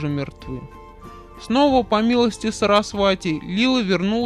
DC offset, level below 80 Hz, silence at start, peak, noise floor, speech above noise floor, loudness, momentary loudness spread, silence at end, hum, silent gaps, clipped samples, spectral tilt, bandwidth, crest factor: under 0.1%; -44 dBFS; 0 s; -4 dBFS; -40 dBFS; 21 dB; -19 LUFS; 16 LU; 0 s; none; none; under 0.1%; -5.5 dB/octave; 12 kHz; 16 dB